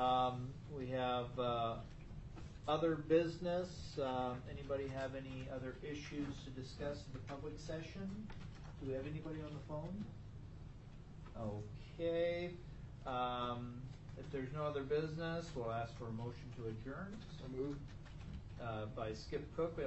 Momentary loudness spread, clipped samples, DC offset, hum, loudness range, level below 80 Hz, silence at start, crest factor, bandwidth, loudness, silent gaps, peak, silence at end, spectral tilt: 15 LU; under 0.1%; under 0.1%; none; 8 LU; -58 dBFS; 0 s; 20 dB; 8.2 kHz; -43 LUFS; none; -22 dBFS; 0 s; -7 dB/octave